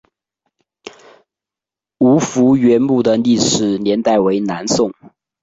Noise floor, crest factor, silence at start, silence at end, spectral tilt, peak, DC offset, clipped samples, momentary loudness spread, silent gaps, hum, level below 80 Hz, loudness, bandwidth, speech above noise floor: -88 dBFS; 14 dB; 0.85 s; 0.5 s; -5 dB/octave; -2 dBFS; under 0.1%; under 0.1%; 5 LU; none; none; -52 dBFS; -14 LUFS; 8 kHz; 74 dB